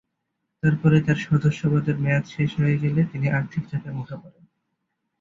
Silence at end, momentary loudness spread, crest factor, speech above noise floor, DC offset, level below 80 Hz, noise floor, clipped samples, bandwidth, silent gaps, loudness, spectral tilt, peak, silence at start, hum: 0.9 s; 12 LU; 16 dB; 56 dB; under 0.1%; -54 dBFS; -78 dBFS; under 0.1%; 7.4 kHz; none; -23 LUFS; -8 dB/octave; -6 dBFS; 0.65 s; none